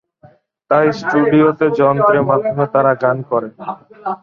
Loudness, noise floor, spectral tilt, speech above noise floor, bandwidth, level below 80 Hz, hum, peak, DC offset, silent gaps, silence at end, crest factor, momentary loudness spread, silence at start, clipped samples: -14 LUFS; -48 dBFS; -8.5 dB/octave; 34 dB; 7 kHz; -56 dBFS; none; -2 dBFS; under 0.1%; none; 0.05 s; 14 dB; 14 LU; 0.7 s; under 0.1%